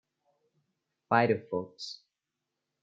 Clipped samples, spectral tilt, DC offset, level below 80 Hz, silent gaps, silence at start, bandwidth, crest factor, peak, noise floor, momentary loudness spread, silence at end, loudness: under 0.1%; -6 dB/octave; under 0.1%; -80 dBFS; none; 1.1 s; 7.8 kHz; 24 dB; -10 dBFS; -87 dBFS; 16 LU; 0.9 s; -29 LUFS